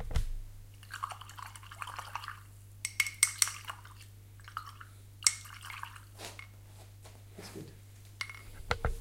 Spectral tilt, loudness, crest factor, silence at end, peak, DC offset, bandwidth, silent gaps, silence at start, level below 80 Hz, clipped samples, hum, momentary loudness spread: -1 dB/octave; -35 LUFS; 34 dB; 0 s; -4 dBFS; under 0.1%; 17 kHz; none; 0 s; -46 dBFS; under 0.1%; none; 23 LU